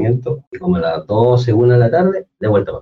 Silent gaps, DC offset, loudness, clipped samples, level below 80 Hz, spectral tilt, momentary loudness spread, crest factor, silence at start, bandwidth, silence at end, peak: 0.47-0.52 s; under 0.1%; -15 LUFS; under 0.1%; -46 dBFS; -9.5 dB/octave; 9 LU; 10 dB; 0 s; 6.4 kHz; 0 s; -4 dBFS